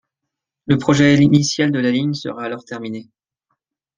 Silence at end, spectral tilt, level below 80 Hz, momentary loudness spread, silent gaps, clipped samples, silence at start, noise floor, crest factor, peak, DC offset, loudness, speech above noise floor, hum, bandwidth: 0.95 s; -5.5 dB/octave; -52 dBFS; 17 LU; none; under 0.1%; 0.7 s; -82 dBFS; 16 dB; -2 dBFS; under 0.1%; -16 LUFS; 65 dB; none; 9.6 kHz